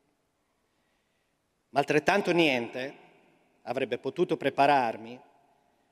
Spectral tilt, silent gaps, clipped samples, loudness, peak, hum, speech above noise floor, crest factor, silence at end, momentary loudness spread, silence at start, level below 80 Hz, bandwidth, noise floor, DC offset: -5 dB/octave; none; under 0.1%; -27 LUFS; -8 dBFS; none; 48 dB; 22 dB; 0.75 s; 16 LU; 1.75 s; -70 dBFS; 15 kHz; -75 dBFS; under 0.1%